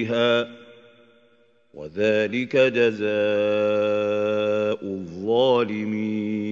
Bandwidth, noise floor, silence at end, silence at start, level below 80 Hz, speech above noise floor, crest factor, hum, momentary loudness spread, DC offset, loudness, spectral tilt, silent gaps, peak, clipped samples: 7.4 kHz; -60 dBFS; 0 s; 0 s; -68 dBFS; 38 dB; 16 dB; none; 10 LU; under 0.1%; -22 LUFS; -6.5 dB/octave; none; -8 dBFS; under 0.1%